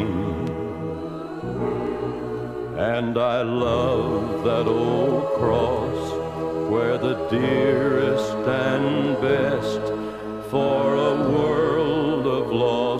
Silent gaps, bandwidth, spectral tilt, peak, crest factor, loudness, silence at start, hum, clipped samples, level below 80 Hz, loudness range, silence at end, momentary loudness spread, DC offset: none; 13.5 kHz; -7 dB/octave; -6 dBFS; 16 dB; -23 LUFS; 0 s; none; under 0.1%; -46 dBFS; 3 LU; 0 s; 9 LU; under 0.1%